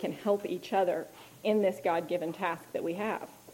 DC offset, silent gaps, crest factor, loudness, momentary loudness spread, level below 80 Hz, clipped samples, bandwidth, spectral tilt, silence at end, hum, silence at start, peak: under 0.1%; none; 16 dB; -32 LUFS; 8 LU; -78 dBFS; under 0.1%; 16.5 kHz; -5.5 dB/octave; 0 s; none; 0 s; -16 dBFS